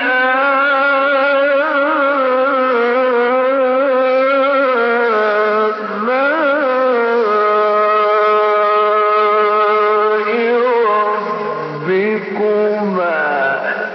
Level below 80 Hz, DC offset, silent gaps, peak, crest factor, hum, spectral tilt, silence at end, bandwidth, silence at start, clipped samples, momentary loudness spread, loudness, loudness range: -74 dBFS; under 0.1%; none; -6 dBFS; 8 dB; none; -2 dB/octave; 0 s; 6 kHz; 0 s; under 0.1%; 4 LU; -14 LUFS; 3 LU